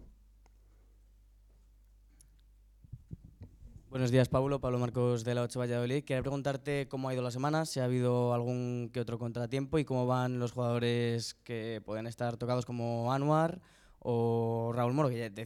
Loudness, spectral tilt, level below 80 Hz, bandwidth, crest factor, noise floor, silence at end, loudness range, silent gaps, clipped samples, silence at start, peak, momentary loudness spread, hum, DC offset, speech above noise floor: -33 LUFS; -7 dB/octave; -60 dBFS; 14 kHz; 20 dB; -61 dBFS; 0 s; 2 LU; none; under 0.1%; 0 s; -14 dBFS; 10 LU; none; under 0.1%; 29 dB